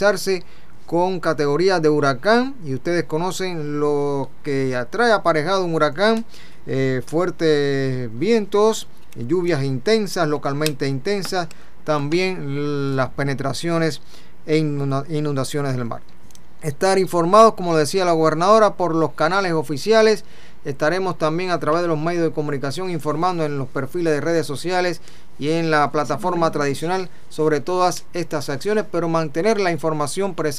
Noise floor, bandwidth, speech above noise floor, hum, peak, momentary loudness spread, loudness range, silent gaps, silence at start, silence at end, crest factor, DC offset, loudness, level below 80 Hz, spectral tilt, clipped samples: -48 dBFS; 15.5 kHz; 28 dB; none; 0 dBFS; 9 LU; 6 LU; none; 0 s; 0 s; 20 dB; 4%; -20 LUFS; -54 dBFS; -5.5 dB/octave; under 0.1%